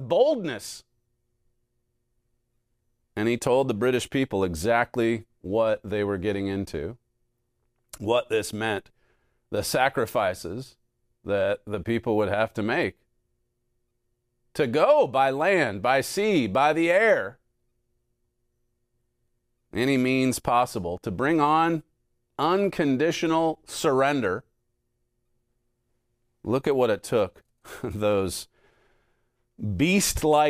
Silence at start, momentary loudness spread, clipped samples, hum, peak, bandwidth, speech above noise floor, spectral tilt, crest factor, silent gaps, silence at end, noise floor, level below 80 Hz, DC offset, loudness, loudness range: 0 s; 13 LU; under 0.1%; none; -8 dBFS; 15.5 kHz; 51 dB; -5 dB/octave; 20 dB; none; 0 s; -75 dBFS; -54 dBFS; under 0.1%; -25 LUFS; 6 LU